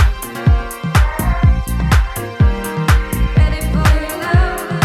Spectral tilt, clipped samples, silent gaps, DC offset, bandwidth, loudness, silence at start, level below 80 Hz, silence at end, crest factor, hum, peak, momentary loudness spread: -6 dB/octave; under 0.1%; none; under 0.1%; 16 kHz; -16 LUFS; 0 s; -16 dBFS; 0 s; 14 dB; none; 0 dBFS; 4 LU